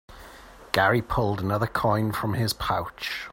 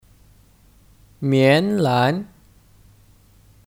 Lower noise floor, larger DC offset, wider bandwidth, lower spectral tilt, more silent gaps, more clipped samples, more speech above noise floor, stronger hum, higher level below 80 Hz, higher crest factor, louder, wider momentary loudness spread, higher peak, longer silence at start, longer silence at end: second, -47 dBFS vs -53 dBFS; neither; about the same, 16.5 kHz vs 16.5 kHz; second, -5.5 dB/octave vs -7 dB/octave; neither; neither; second, 22 dB vs 35 dB; neither; first, -46 dBFS vs -56 dBFS; about the same, 24 dB vs 20 dB; second, -25 LUFS vs -18 LUFS; second, 8 LU vs 13 LU; about the same, -2 dBFS vs -2 dBFS; second, 0.1 s vs 1.2 s; second, 0 s vs 1.45 s